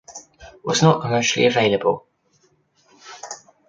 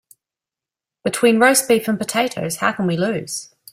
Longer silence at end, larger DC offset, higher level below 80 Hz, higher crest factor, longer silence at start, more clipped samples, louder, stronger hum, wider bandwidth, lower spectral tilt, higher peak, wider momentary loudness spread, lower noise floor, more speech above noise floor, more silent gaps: about the same, 0.35 s vs 0.3 s; neither; about the same, -58 dBFS vs -62 dBFS; about the same, 20 dB vs 18 dB; second, 0.1 s vs 1.05 s; neither; about the same, -18 LUFS vs -18 LUFS; neither; second, 9 kHz vs 16 kHz; about the same, -4.5 dB/octave vs -3.5 dB/octave; about the same, -2 dBFS vs -2 dBFS; first, 22 LU vs 12 LU; second, -62 dBFS vs -88 dBFS; second, 44 dB vs 71 dB; neither